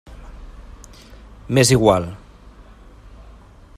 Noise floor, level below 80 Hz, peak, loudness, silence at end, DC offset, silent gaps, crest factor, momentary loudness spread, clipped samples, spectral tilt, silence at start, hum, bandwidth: -44 dBFS; -40 dBFS; -2 dBFS; -16 LUFS; 1.6 s; under 0.1%; none; 22 dB; 28 LU; under 0.1%; -5 dB/octave; 0.1 s; none; 15.5 kHz